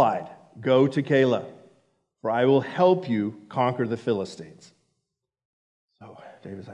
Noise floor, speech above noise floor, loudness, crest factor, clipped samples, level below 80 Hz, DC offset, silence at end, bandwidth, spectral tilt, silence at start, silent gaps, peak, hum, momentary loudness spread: -82 dBFS; 58 dB; -24 LUFS; 18 dB; under 0.1%; -76 dBFS; under 0.1%; 0 s; 10 kHz; -7.5 dB/octave; 0 s; 5.45-5.88 s; -6 dBFS; none; 20 LU